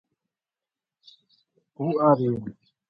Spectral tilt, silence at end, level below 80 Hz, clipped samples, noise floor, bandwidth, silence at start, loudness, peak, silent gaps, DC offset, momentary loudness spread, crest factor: -11 dB/octave; 0.4 s; -66 dBFS; under 0.1%; under -90 dBFS; 5.8 kHz; 1.8 s; -24 LUFS; -6 dBFS; none; under 0.1%; 13 LU; 22 dB